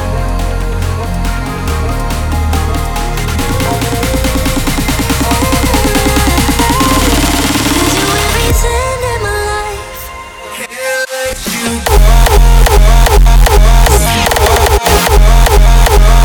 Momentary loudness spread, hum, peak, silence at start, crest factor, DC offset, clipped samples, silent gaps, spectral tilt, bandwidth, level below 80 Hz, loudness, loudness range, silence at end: 8 LU; none; 0 dBFS; 0 s; 8 dB; under 0.1%; under 0.1%; none; -4 dB/octave; over 20 kHz; -10 dBFS; -11 LUFS; 7 LU; 0 s